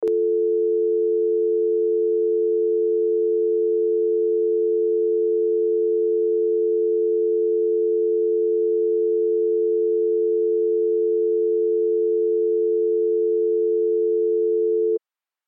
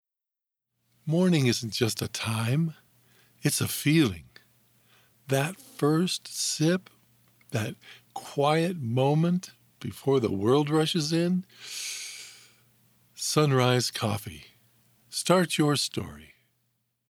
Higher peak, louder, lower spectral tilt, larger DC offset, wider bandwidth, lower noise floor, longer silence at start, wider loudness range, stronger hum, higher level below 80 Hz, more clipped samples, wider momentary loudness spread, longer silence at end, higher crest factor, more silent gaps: second, -14 dBFS vs -6 dBFS; first, -21 LUFS vs -27 LUFS; first, -9.5 dB/octave vs -5 dB/octave; neither; second, 0.8 kHz vs 20 kHz; second, -56 dBFS vs -87 dBFS; second, 0 s vs 1.05 s; second, 0 LU vs 3 LU; neither; second, -88 dBFS vs -68 dBFS; neither; second, 0 LU vs 16 LU; second, 0.5 s vs 0.85 s; second, 6 dB vs 22 dB; neither